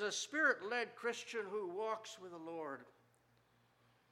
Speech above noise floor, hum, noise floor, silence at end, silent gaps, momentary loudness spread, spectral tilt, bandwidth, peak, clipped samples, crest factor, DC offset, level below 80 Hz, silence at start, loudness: 32 dB; 60 Hz at -80 dBFS; -74 dBFS; 1.2 s; none; 15 LU; -2 dB/octave; 15.5 kHz; -22 dBFS; under 0.1%; 20 dB; under 0.1%; under -90 dBFS; 0 s; -40 LUFS